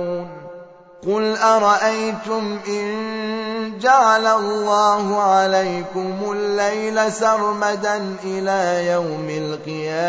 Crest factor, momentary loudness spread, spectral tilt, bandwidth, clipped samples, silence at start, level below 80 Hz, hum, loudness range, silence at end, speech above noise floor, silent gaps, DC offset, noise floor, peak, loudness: 16 dB; 11 LU; -4 dB/octave; 8 kHz; under 0.1%; 0 s; -66 dBFS; none; 3 LU; 0 s; 22 dB; none; under 0.1%; -41 dBFS; -2 dBFS; -19 LUFS